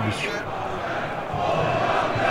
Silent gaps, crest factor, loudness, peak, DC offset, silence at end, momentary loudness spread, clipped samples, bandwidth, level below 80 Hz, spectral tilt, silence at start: none; 14 dB; -25 LUFS; -10 dBFS; under 0.1%; 0 s; 7 LU; under 0.1%; 16 kHz; -46 dBFS; -5.5 dB/octave; 0 s